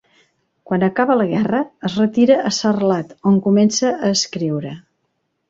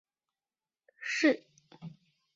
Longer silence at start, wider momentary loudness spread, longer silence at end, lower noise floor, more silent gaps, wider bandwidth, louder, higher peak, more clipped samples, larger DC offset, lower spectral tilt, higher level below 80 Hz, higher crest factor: second, 0.7 s vs 1 s; second, 9 LU vs 23 LU; first, 0.7 s vs 0.45 s; second, -70 dBFS vs under -90 dBFS; neither; about the same, 7.8 kHz vs 7.6 kHz; first, -17 LUFS vs -31 LUFS; first, -2 dBFS vs -14 dBFS; neither; neither; first, -5 dB/octave vs -3 dB/octave; first, -58 dBFS vs -84 dBFS; second, 16 dB vs 22 dB